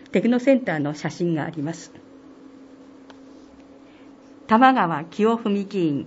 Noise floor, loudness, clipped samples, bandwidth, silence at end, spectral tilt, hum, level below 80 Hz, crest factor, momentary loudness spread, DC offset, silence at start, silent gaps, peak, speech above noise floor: -47 dBFS; -21 LUFS; under 0.1%; 8 kHz; 0 s; -6.5 dB/octave; none; -68 dBFS; 22 dB; 14 LU; under 0.1%; 0.1 s; none; -2 dBFS; 26 dB